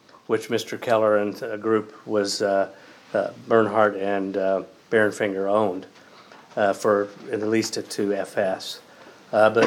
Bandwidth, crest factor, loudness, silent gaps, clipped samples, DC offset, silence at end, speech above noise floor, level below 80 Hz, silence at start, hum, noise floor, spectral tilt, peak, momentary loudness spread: 16.5 kHz; 18 dB; -24 LUFS; none; under 0.1%; under 0.1%; 0 s; 26 dB; -78 dBFS; 0.3 s; none; -48 dBFS; -4.5 dB/octave; -4 dBFS; 9 LU